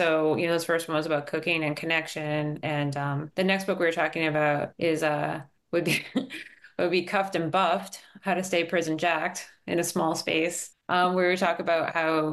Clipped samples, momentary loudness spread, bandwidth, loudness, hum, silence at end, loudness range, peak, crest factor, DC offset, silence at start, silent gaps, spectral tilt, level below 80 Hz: under 0.1%; 7 LU; 12.5 kHz; -27 LUFS; none; 0 s; 2 LU; -10 dBFS; 16 dB; under 0.1%; 0 s; none; -4.5 dB/octave; -72 dBFS